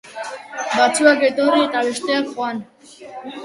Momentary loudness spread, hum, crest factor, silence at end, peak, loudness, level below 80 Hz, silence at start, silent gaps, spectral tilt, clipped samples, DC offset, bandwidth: 18 LU; none; 18 dB; 0 s; 0 dBFS; -17 LUFS; -70 dBFS; 0.05 s; none; -2.5 dB/octave; under 0.1%; under 0.1%; 11.5 kHz